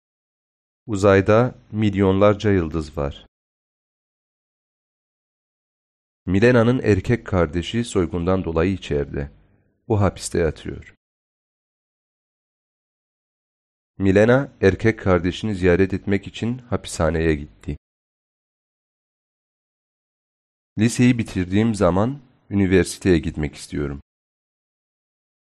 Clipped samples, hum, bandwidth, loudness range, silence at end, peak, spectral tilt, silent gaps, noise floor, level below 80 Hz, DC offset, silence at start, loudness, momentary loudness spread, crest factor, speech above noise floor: under 0.1%; none; 11.5 kHz; 9 LU; 1.55 s; -4 dBFS; -6.5 dB/octave; 3.28-6.26 s, 10.97-13.94 s, 17.78-20.76 s; -59 dBFS; -42 dBFS; under 0.1%; 0.85 s; -20 LUFS; 13 LU; 18 dB; 40 dB